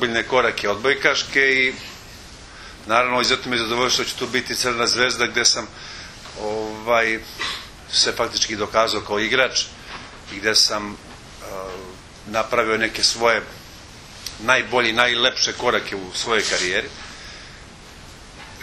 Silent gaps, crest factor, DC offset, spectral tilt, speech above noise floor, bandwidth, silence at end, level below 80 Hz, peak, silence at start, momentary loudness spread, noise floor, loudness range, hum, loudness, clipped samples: none; 22 dB; under 0.1%; -1.5 dB/octave; 21 dB; 13.5 kHz; 0 s; -48 dBFS; 0 dBFS; 0 s; 22 LU; -41 dBFS; 3 LU; none; -19 LUFS; under 0.1%